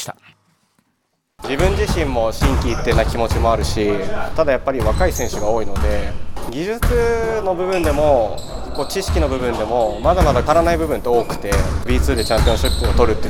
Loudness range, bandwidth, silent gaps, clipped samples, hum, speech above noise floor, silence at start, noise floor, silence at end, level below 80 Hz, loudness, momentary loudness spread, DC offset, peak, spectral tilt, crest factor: 3 LU; 17.5 kHz; none; under 0.1%; none; 52 dB; 0 s; -68 dBFS; 0 s; -24 dBFS; -18 LUFS; 8 LU; under 0.1%; 0 dBFS; -5.5 dB/octave; 16 dB